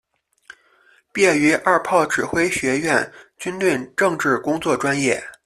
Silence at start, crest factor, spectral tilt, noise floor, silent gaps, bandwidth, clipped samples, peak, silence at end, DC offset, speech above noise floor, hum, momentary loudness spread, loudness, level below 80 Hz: 1.15 s; 18 dB; -4 dB/octave; -56 dBFS; none; 14 kHz; under 0.1%; -2 dBFS; 0.1 s; under 0.1%; 37 dB; none; 6 LU; -19 LUFS; -56 dBFS